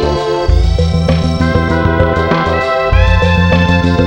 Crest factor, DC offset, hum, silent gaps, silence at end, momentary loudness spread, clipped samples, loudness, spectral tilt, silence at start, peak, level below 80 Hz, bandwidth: 10 dB; under 0.1%; none; none; 0 s; 3 LU; under 0.1%; -12 LUFS; -7 dB/octave; 0 s; 0 dBFS; -16 dBFS; 9 kHz